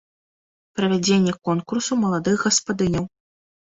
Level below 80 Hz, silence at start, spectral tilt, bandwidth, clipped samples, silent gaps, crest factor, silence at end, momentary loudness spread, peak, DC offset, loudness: -52 dBFS; 0.75 s; -4.5 dB/octave; 8 kHz; under 0.1%; none; 18 dB; 0.55 s; 7 LU; -4 dBFS; under 0.1%; -21 LUFS